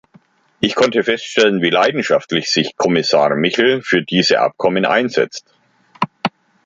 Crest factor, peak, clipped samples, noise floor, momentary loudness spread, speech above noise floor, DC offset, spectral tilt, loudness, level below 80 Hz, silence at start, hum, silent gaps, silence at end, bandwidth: 16 dB; 0 dBFS; under 0.1%; -52 dBFS; 8 LU; 37 dB; under 0.1%; -4 dB/octave; -16 LUFS; -58 dBFS; 0.6 s; none; none; 0.35 s; 7.8 kHz